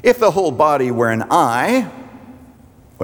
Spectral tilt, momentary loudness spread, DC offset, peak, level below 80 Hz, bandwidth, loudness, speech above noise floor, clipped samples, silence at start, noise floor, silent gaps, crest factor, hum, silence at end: -5.5 dB/octave; 6 LU; under 0.1%; -2 dBFS; -54 dBFS; over 20 kHz; -16 LUFS; 30 dB; under 0.1%; 0.05 s; -45 dBFS; none; 16 dB; none; 0 s